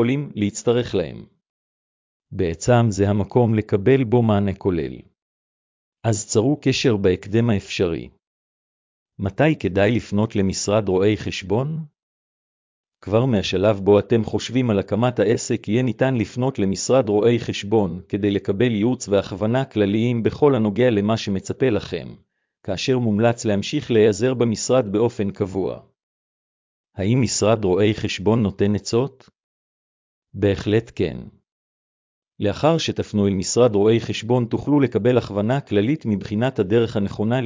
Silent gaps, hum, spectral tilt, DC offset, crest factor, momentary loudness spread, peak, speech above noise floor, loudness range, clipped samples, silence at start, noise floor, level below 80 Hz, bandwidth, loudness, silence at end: 1.49-2.20 s, 5.22-5.92 s, 8.27-9.06 s, 12.03-12.84 s, 26.03-26.84 s, 29.43-30.22 s, 31.52-32.22 s; none; -6 dB/octave; under 0.1%; 16 dB; 8 LU; -4 dBFS; over 70 dB; 3 LU; under 0.1%; 0 s; under -90 dBFS; -44 dBFS; 7.6 kHz; -20 LUFS; 0 s